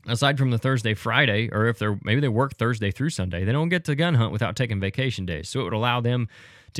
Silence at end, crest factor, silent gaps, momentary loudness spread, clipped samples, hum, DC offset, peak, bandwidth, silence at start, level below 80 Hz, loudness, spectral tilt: 0 s; 20 dB; none; 6 LU; under 0.1%; none; under 0.1%; -4 dBFS; 13.5 kHz; 0.05 s; -52 dBFS; -24 LUFS; -6 dB/octave